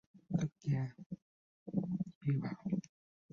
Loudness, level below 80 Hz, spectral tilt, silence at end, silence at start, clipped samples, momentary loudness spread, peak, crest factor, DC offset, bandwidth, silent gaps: -39 LUFS; -70 dBFS; -9.5 dB/octave; 0.5 s; 0.15 s; under 0.1%; 14 LU; -22 dBFS; 18 dB; under 0.1%; 7 kHz; 1.06-1.10 s, 1.22-1.66 s, 2.15-2.21 s